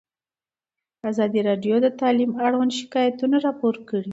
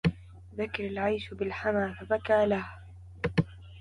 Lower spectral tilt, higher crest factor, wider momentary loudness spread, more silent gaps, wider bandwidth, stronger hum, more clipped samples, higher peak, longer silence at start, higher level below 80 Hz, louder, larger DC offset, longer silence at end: second, -6 dB/octave vs -7.5 dB/octave; about the same, 14 dB vs 18 dB; second, 5 LU vs 18 LU; neither; second, 8 kHz vs 11 kHz; neither; neither; first, -8 dBFS vs -12 dBFS; first, 1.05 s vs 0.05 s; second, -72 dBFS vs -50 dBFS; first, -22 LUFS vs -30 LUFS; neither; about the same, 0 s vs 0 s